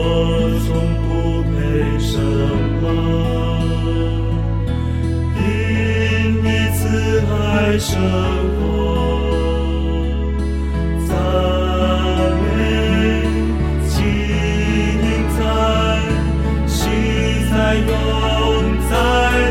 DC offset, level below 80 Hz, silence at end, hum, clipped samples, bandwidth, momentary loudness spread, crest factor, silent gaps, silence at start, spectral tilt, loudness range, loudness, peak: under 0.1%; -22 dBFS; 0 s; none; under 0.1%; 16 kHz; 4 LU; 12 dB; none; 0 s; -6.5 dB/octave; 2 LU; -17 LUFS; -4 dBFS